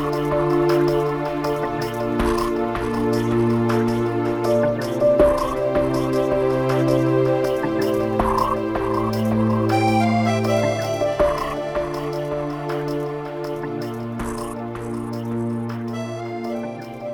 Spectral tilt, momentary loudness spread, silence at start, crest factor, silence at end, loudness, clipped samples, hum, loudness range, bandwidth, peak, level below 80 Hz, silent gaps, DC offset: -7 dB/octave; 10 LU; 0 s; 18 dB; 0 s; -21 LUFS; under 0.1%; none; 8 LU; over 20 kHz; -2 dBFS; -40 dBFS; none; under 0.1%